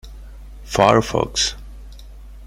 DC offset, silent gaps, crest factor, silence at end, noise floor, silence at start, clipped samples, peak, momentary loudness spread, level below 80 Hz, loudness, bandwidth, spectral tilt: under 0.1%; none; 20 dB; 0 s; -38 dBFS; 0.05 s; under 0.1%; 0 dBFS; 21 LU; -36 dBFS; -18 LUFS; 16 kHz; -4 dB/octave